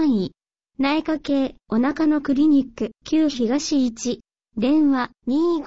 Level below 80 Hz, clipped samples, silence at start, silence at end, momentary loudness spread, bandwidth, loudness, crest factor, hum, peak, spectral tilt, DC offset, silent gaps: -54 dBFS; under 0.1%; 0 s; 0 s; 10 LU; 8 kHz; -21 LUFS; 12 dB; none; -10 dBFS; -5 dB/octave; 0.4%; none